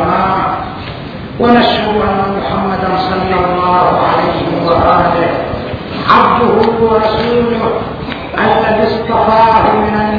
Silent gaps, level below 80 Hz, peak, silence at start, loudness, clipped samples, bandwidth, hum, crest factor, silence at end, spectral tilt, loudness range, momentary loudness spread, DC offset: none; -32 dBFS; 0 dBFS; 0 s; -11 LUFS; 0.3%; 5.4 kHz; none; 12 dB; 0 s; -8 dB/octave; 2 LU; 11 LU; under 0.1%